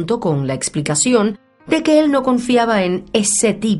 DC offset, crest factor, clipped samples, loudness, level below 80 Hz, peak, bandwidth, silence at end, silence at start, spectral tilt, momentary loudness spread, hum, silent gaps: under 0.1%; 16 dB; under 0.1%; -16 LUFS; -50 dBFS; 0 dBFS; 11.5 kHz; 0 s; 0 s; -4 dB/octave; 7 LU; none; none